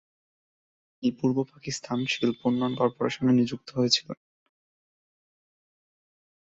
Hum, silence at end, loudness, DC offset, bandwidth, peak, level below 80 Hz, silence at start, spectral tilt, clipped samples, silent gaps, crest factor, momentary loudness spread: none; 2.4 s; -27 LUFS; under 0.1%; 7.8 kHz; -8 dBFS; -66 dBFS; 1 s; -5 dB/octave; under 0.1%; none; 22 dB; 9 LU